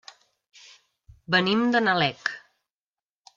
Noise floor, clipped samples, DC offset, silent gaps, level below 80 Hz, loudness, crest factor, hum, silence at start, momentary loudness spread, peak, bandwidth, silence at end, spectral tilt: under -90 dBFS; under 0.1%; under 0.1%; none; -64 dBFS; -23 LUFS; 20 dB; none; 1.3 s; 11 LU; -6 dBFS; 7.4 kHz; 1 s; -5.5 dB/octave